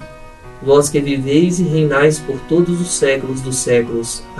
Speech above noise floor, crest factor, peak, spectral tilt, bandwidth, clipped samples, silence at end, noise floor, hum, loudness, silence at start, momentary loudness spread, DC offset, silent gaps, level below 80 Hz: 20 dB; 16 dB; 0 dBFS; -5 dB/octave; 12.5 kHz; under 0.1%; 0 s; -35 dBFS; none; -15 LUFS; 0 s; 8 LU; under 0.1%; none; -40 dBFS